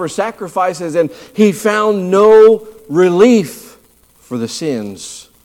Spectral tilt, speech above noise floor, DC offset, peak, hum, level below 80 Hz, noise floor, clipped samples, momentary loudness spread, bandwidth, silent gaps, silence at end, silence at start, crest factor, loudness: -5.5 dB/octave; 37 dB; under 0.1%; 0 dBFS; none; -56 dBFS; -49 dBFS; under 0.1%; 17 LU; 15.5 kHz; none; 0.25 s; 0 s; 12 dB; -12 LUFS